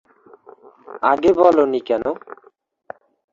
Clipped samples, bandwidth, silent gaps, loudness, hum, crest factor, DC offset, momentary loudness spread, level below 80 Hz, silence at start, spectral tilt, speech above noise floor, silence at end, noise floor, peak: under 0.1%; 7.4 kHz; none; -17 LUFS; none; 18 dB; under 0.1%; 16 LU; -56 dBFS; 0.9 s; -6.5 dB/octave; 39 dB; 1 s; -55 dBFS; -2 dBFS